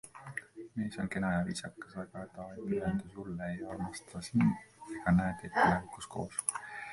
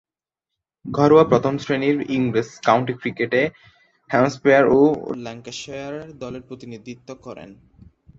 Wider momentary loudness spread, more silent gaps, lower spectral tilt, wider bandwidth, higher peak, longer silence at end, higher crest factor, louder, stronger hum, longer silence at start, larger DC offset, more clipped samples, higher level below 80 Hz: second, 15 LU vs 22 LU; neither; about the same, -5.5 dB/octave vs -6.5 dB/octave; first, 11.5 kHz vs 7.8 kHz; second, -12 dBFS vs -2 dBFS; second, 0 s vs 0.65 s; about the same, 24 dB vs 20 dB; second, -35 LUFS vs -19 LUFS; neither; second, 0.05 s vs 0.85 s; neither; neither; about the same, -56 dBFS vs -56 dBFS